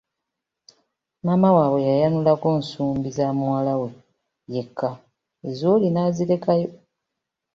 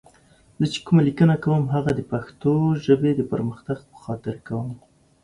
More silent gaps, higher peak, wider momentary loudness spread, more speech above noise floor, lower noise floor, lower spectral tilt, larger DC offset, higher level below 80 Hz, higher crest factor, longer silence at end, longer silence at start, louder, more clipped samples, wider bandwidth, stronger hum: neither; about the same, -4 dBFS vs -4 dBFS; about the same, 13 LU vs 13 LU; first, 62 dB vs 34 dB; first, -83 dBFS vs -55 dBFS; about the same, -8.5 dB/octave vs -8 dB/octave; neither; second, -60 dBFS vs -52 dBFS; about the same, 18 dB vs 18 dB; first, 0.8 s vs 0.5 s; first, 1.25 s vs 0.6 s; about the same, -21 LUFS vs -22 LUFS; neither; second, 7.6 kHz vs 10.5 kHz; neither